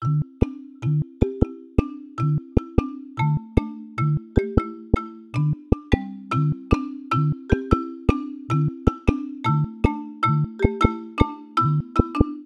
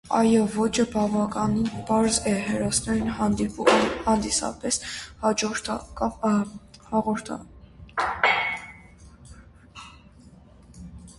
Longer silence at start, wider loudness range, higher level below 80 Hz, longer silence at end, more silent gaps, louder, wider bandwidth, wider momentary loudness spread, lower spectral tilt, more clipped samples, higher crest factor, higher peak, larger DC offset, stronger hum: about the same, 0 s vs 0.05 s; second, 2 LU vs 6 LU; first, -32 dBFS vs -48 dBFS; about the same, 0 s vs 0.05 s; neither; about the same, -24 LUFS vs -24 LUFS; second, 7 kHz vs 11.5 kHz; second, 4 LU vs 14 LU; first, -9 dB/octave vs -4 dB/octave; neither; about the same, 20 dB vs 20 dB; about the same, -4 dBFS vs -4 dBFS; neither; neither